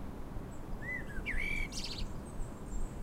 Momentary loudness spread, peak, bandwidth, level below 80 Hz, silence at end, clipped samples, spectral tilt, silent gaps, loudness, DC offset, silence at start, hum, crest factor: 10 LU; -24 dBFS; 15.5 kHz; -42 dBFS; 0 s; under 0.1%; -4 dB/octave; none; -41 LUFS; under 0.1%; 0 s; none; 14 dB